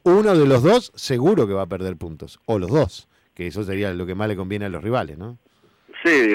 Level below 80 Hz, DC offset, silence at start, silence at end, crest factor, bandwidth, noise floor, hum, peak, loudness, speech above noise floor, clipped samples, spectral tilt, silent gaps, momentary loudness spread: -50 dBFS; under 0.1%; 0.05 s; 0 s; 12 dB; 15.5 kHz; -53 dBFS; none; -8 dBFS; -20 LUFS; 33 dB; under 0.1%; -6.5 dB/octave; none; 19 LU